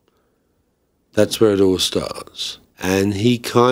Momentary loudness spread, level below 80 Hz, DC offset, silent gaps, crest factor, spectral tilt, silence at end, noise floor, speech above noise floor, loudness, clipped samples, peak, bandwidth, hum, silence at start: 12 LU; -52 dBFS; under 0.1%; none; 18 dB; -5 dB/octave; 0 s; -65 dBFS; 48 dB; -18 LUFS; under 0.1%; 0 dBFS; 16 kHz; none; 1.15 s